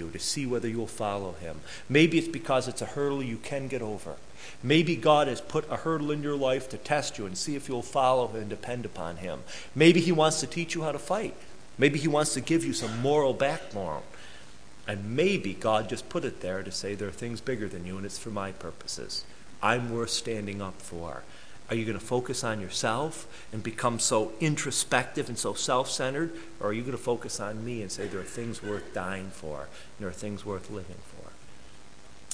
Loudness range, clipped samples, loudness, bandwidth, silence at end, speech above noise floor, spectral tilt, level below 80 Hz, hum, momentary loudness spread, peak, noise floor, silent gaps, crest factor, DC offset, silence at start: 8 LU; under 0.1%; -29 LUFS; 11 kHz; 0 s; 23 dB; -4.5 dB/octave; -58 dBFS; none; 15 LU; -4 dBFS; -53 dBFS; none; 24 dB; 0.8%; 0 s